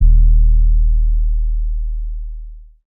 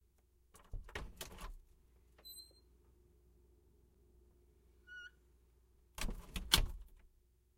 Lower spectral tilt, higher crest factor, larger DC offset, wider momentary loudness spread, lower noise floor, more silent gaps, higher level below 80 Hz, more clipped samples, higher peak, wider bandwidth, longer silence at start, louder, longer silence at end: first, -26 dB/octave vs -2 dB/octave; second, 10 dB vs 36 dB; neither; second, 18 LU vs 24 LU; second, -32 dBFS vs -72 dBFS; neither; first, -12 dBFS vs -50 dBFS; neither; first, -2 dBFS vs -10 dBFS; second, 0.3 kHz vs 16 kHz; second, 0 s vs 0.55 s; first, -18 LUFS vs -40 LUFS; second, 0.35 s vs 0.5 s